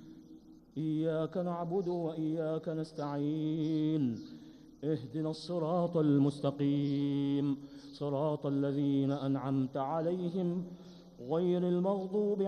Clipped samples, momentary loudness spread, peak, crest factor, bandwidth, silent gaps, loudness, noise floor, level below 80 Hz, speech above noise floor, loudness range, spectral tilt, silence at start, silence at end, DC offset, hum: under 0.1%; 10 LU; -18 dBFS; 14 dB; 9.4 kHz; none; -34 LUFS; -56 dBFS; -70 dBFS; 23 dB; 3 LU; -9 dB/octave; 0 s; 0 s; under 0.1%; none